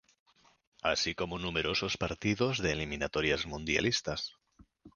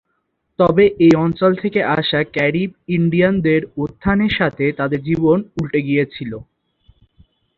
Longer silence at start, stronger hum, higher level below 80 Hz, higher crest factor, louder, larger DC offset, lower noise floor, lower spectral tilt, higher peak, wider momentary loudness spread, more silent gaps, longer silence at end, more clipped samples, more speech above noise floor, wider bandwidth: first, 0.85 s vs 0.6 s; neither; second, -52 dBFS vs -44 dBFS; about the same, 20 dB vs 16 dB; second, -32 LUFS vs -17 LUFS; neither; second, -60 dBFS vs -70 dBFS; second, -4 dB/octave vs -8 dB/octave; second, -14 dBFS vs -2 dBFS; second, 6 LU vs 10 LU; neither; second, 0.05 s vs 1.2 s; neither; second, 27 dB vs 54 dB; first, 10 kHz vs 7.2 kHz